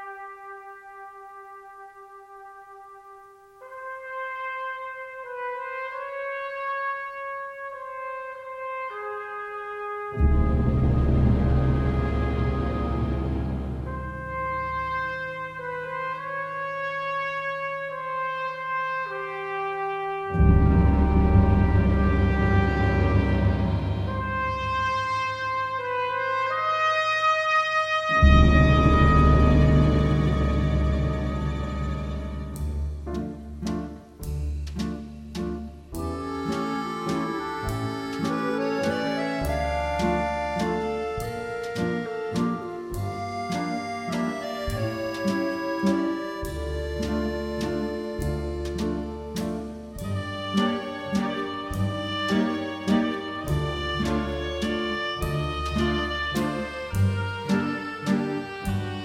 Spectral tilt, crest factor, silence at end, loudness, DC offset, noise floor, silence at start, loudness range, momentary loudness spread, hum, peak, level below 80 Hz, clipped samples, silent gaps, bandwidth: -7 dB/octave; 20 dB; 0 s; -26 LUFS; under 0.1%; -49 dBFS; 0 s; 12 LU; 14 LU; none; -4 dBFS; -30 dBFS; under 0.1%; none; 15 kHz